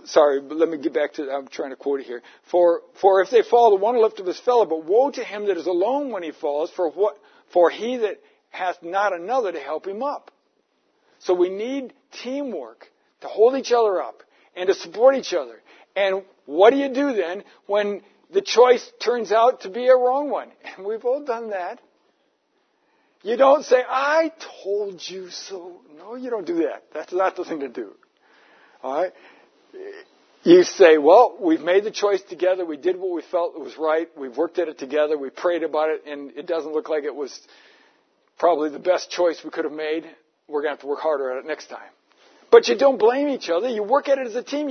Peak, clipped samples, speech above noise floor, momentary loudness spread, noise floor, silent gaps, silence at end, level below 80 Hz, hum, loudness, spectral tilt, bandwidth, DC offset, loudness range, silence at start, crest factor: 0 dBFS; under 0.1%; 47 dB; 18 LU; -68 dBFS; none; 0 s; -84 dBFS; none; -21 LUFS; -4 dB/octave; 6.6 kHz; under 0.1%; 10 LU; 0.05 s; 22 dB